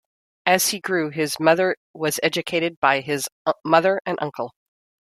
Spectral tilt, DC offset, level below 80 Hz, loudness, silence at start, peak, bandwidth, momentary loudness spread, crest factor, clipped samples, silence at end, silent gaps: -3 dB/octave; under 0.1%; -68 dBFS; -21 LUFS; 0.45 s; -2 dBFS; 16 kHz; 9 LU; 20 dB; under 0.1%; 0.7 s; 1.77-1.94 s, 2.77-2.82 s, 3.32-3.45 s, 4.01-4.05 s